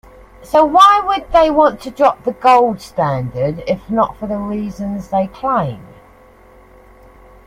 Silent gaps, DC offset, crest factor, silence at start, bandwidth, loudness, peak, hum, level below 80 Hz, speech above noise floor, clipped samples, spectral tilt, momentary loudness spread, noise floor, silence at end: none; under 0.1%; 16 dB; 0.4 s; 16 kHz; -15 LUFS; 0 dBFS; none; -42 dBFS; 30 dB; under 0.1%; -6 dB/octave; 13 LU; -44 dBFS; 1.6 s